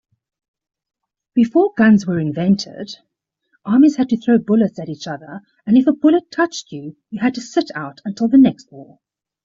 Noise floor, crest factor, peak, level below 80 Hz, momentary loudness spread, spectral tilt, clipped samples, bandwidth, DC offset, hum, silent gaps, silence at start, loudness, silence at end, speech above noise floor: -66 dBFS; 14 dB; -2 dBFS; -60 dBFS; 19 LU; -6.5 dB/octave; under 0.1%; 7.6 kHz; under 0.1%; none; none; 1.35 s; -16 LUFS; 0.6 s; 49 dB